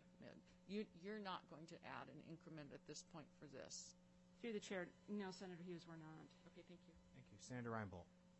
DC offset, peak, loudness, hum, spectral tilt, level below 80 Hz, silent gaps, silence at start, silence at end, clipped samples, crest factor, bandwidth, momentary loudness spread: under 0.1%; -36 dBFS; -55 LUFS; none; -4.5 dB/octave; -82 dBFS; none; 0 s; 0 s; under 0.1%; 20 dB; 8.2 kHz; 14 LU